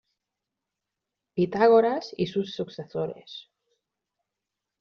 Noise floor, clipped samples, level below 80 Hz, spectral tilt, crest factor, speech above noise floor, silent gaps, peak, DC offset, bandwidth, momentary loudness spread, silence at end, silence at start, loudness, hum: -86 dBFS; under 0.1%; -70 dBFS; -5 dB/octave; 20 dB; 61 dB; none; -8 dBFS; under 0.1%; 6.6 kHz; 20 LU; 1.4 s; 1.35 s; -25 LUFS; none